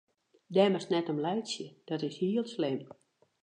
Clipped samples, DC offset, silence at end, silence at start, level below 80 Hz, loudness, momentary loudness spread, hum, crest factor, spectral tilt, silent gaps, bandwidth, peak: under 0.1%; under 0.1%; 0.6 s; 0.5 s; -84 dBFS; -32 LUFS; 12 LU; none; 20 dB; -6 dB/octave; none; 9.8 kHz; -12 dBFS